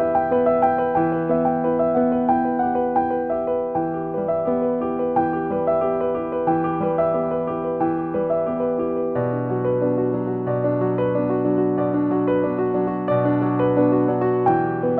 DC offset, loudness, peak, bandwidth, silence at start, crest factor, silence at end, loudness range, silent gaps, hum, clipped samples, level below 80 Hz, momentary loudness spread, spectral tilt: under 0.1%; -21 LUFS; -6 dBFS; 4.1 kHz; 0 s; 14 dB; 0 s; 2 LU; none; none; under 0.1%; -52 dBFS; 4 LU; -12 dB/octave